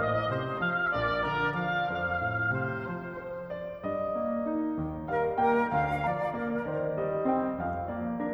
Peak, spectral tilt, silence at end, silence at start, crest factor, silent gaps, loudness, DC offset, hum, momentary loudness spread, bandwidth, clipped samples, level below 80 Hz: -14 dBFS; -8 dB/octave; 0 s; 0 s; 16 dB; none; -30 LUFS; under 0.1%; none; 8 LU; over 20 kHz; under 0.1%; -52 dBFS